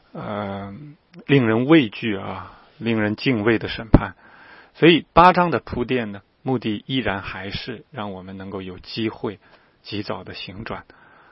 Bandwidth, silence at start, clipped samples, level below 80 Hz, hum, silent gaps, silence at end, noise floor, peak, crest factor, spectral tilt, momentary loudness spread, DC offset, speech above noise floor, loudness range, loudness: 5.8 kHz; 0.15 s; under 0.1%; -38 dBFS; none; none; 0.5 s; -47 dBFS; 0 dBFS; 22 dB; -9 dB/octave; 18 LU; under 0.1%; 26 dB; 12 LU; -21 LUFS